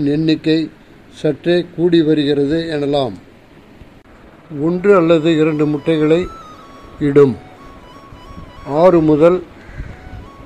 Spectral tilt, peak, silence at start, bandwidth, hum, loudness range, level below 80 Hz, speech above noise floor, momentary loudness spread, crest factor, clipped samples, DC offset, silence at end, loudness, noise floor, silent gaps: -8 dB/octave; 0 dBFS; 0 s; 9.2 kHz; none; 3 LU; -42 dBFS; 29 dB; 22 LU; 16 dB; under 0.1%; 0.2%; 0 s; -14 LUFS; -43 dBFS; none